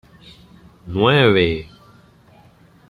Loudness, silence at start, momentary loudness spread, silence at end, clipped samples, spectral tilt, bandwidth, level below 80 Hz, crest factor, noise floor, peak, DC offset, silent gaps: -16 LUFS; 0.85 s; 15 LU; 1.25 s; under 0.1%; -7.5 dB/octave; 11.5 kHz; -46 dBFS; 20 dB; -50 dBFS; -2 dBFS; under 0.1%; none